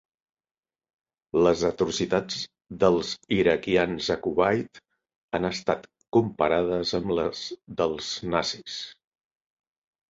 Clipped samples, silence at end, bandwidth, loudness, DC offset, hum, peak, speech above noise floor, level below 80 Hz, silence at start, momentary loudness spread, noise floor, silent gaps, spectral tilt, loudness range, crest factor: under 0.1%; 1.15 s; 7.8 kHz; -26 LUFS; under 0.1%; none; -6 dBFS; over 65 dB; -54 dBFS; 1.35 s; 11 LU; under -90 dBFS; 5.16-5.29 s, 6.08-6.12 s; -5 dB/octave; 3 LU; 20 dB